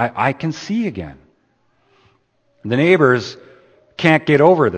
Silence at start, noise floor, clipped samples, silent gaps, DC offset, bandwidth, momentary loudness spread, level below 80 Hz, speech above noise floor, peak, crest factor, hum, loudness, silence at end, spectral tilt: 0 s; -61 dBFS; under 0.1%; none; under 0.1%; 8.8 kHz; 20 LU; -54 dBFS; 46 dB; 0 dBFS; 18 dB; none; -16 LUFS; 0 s; -7 dB/octave